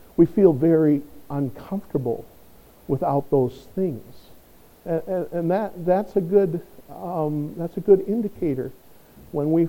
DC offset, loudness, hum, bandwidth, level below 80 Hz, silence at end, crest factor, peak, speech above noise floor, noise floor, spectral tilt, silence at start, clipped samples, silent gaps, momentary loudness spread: under 0.1%; -23 LUFS; none; 17 kHz; -54 dBFS; 0 s; 20 dB; -4 dBFS; 28 dB; -50 dBFS; -10 dB/octave; 0.2 s; under 0.1%; none; 14 LU